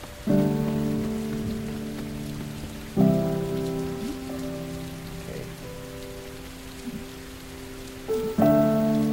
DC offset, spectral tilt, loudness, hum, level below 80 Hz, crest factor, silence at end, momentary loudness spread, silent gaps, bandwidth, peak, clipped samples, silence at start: under 0.1%; -7 dB/octave; -27 LUFS; none; -46 dBFS; 20 dB; 0 s; 17 LU; none; 16.5 kHz; -8 dBFS; under 0.1%; 0 s